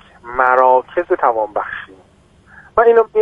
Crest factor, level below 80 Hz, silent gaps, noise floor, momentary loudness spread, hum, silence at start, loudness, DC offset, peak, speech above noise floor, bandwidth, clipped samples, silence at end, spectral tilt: 16 dB; -50 dBFS; none; -49 dBFS; 13 LU; none; 0.25 s; -15 LUFS; under 0.1%; 0 dBFS; 35 dB; 3.8 kHz; under 0.1%; 0 s; -6.5 dB/octave